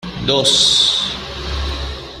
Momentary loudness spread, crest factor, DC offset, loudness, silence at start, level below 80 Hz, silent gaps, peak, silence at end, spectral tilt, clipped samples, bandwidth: 15 LU; 16 dB; under 0.1%; -14 LUFS; 0 s; -30 dBFS; none; 0 dBFS; 0 s; -2 dB/octave; under 0.1%; 14.5 kHz